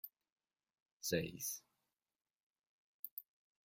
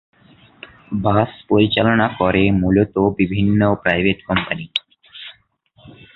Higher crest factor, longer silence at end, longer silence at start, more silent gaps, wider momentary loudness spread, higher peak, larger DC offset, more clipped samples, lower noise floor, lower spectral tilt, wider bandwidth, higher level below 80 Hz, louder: first, 26 dB vs 18 dB; first, 0.45 s vs 0.25 s; second, 0.05 s vs 0.9 s; first, 0.32-0.36 s, 0.82-1.00 s, 2.36-2.56 s, 2.69-3.03 s, 3.11-3.17 s vs none; first, 14 LU vs 11 LU; second, -22 dBFS vs -2 dBFS; neither; neither; first, -89 dBFS vs -55 dBFS; second, -3.5 dB/octave vs -9 dB/octave; first, 16.5 kHz vs 4.8 kHz; second, -78 dBFS vs -40 dBFS; second, -44 LUFS vs -17 LUFS